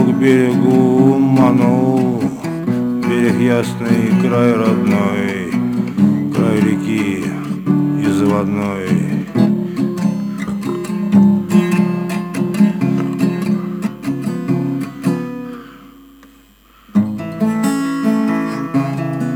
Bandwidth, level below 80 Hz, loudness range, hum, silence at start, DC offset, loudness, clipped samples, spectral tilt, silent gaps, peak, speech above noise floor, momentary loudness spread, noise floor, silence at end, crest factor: 17 kHz; -52 dBFS; 7 LU; none; 0 s; under 0.1%; -16 LUFS; under 0.1%; -7.5 dB/octave; none; 0 dBFS; 34 dB; 9 LU; -47 dBFS; 0 s; 14 dB